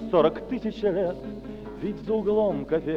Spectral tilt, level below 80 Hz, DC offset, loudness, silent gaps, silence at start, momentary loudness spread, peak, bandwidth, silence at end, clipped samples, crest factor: -8.5 dB/octave; -48 dBFS; under 0.1%; -26 LUFS; none; 0 s; 14 LU; -8 dBFS; 6.8 kHz; 0 s; under 0.1%; 18 dB